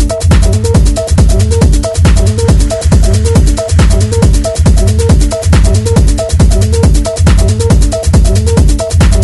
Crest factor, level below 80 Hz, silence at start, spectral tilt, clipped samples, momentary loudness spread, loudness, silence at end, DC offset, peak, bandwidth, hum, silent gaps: 6 dB; -10 dBFS; 0 s; -6 dB/octave; 0.1%; 1 LU; -9 LUFS; 0 s; under 0.1%; 0 dBFS; 12 kHz; none; none